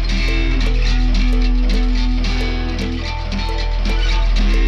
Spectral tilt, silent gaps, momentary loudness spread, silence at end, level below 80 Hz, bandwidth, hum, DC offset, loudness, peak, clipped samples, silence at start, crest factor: -5.5 dB/octave; none; 4 LU; 0 s; -16 dBFS; 7.2 kHz; none; under 0.1%; -20 LUFS; -6 dBFS; under 0.1%; 0 s; 10 dB